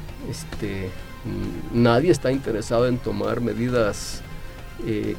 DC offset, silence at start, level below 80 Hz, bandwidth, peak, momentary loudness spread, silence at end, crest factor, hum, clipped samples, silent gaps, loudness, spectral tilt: under 0.1%; 0 s; -38 dBFS; 16.5 kHz; -4 dBFS; 16 LU; 0 s; 18 dB; none; under 0.1%; none; -24 LUFS; -6 dB/octave